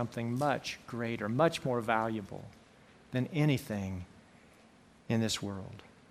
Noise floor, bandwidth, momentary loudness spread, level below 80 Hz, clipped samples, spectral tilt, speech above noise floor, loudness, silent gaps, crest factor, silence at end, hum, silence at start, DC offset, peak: -60 dBFS; 15.5 kHz; 17 LU; -66 dBFS; under 0.1%; -5.5 dB/octave; 27 dB; -33 LUFS; none; 22 dB; 0.2 s; none; 0 s; under 0.1%; -12 dBFS